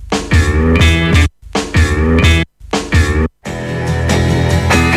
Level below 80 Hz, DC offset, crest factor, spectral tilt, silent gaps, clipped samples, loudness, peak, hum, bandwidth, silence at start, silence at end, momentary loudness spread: -18 dBFS; under 0.1%; 12 dB; -5.5 dB/octave; none; under 0.1%; -13 LUFS; 0 dBFS; none; 13.5 kHz; 0 s; 0 s; 9 LU